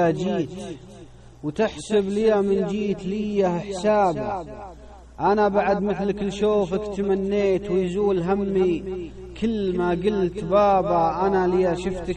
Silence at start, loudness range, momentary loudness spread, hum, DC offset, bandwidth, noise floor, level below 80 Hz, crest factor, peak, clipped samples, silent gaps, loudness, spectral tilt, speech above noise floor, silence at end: 0 s; 2 LU; 12 LU; none; under 0.1%; 9.8 kHz; -44 dBFS; -44 dBFS; 14 dB; -8 dBFS; under 0.1%; none; -23 LUFS; -7 dB/octave; 22 dB; 0 s